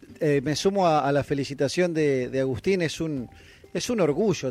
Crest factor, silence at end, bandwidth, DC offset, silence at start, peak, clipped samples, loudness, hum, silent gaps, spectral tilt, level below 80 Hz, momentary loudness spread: 14 dB; 0 s; 14.5 kHz; under 0.1%; 0.1 s; -10 dBFS; under 0.1%; -25 LUFS; none; none; -5.5 dB/octave; -54 dBFS; 9 LU